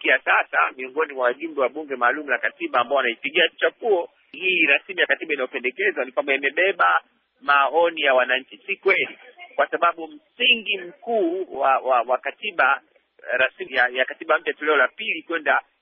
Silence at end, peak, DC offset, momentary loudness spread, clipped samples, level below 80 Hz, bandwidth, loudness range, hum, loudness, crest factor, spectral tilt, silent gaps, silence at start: 0.2 s; -6 dBFS; under 0.1%; 8 LU; under 0.1%; -76 dBFS; 4.5 kHz; 2 LU; none; -21 LUFS; 16 dB; 1.5 dB/octave; none; 0 s